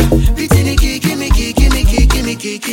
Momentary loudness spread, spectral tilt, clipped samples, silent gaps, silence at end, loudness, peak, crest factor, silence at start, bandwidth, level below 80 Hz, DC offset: 4 LU; -5 dB/octave; under 0.1%; none; 0 s; -13 LUFS; 0 dBFS; 12 dB; 0 s; 17 kHz; -14 dBFS; under 0.1%